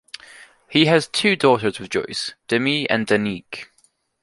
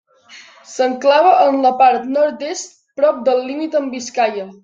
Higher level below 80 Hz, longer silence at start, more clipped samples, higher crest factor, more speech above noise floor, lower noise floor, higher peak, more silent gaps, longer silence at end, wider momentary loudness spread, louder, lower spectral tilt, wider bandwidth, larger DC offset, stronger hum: first, -58 dBFS vs -70 dBFS; about the same, 0.4 s vs 0.3 s; neither; first, 20 dB vs 14 dB; first, 42 dB vs 28 dB; first, -62 dBFS vs -43 dBFS; about the same, -2 dBFS vs -2 dBFS; neither; first, 0.6 s vs 0.1 s; first, 18 LU vs 13 LU; second, -19 LUFS vs -15 LUFS; first, -4.5 dB/octave vs -3 dB/octave; first, 11.5 kHz vs 7.8 kHz; neither; neither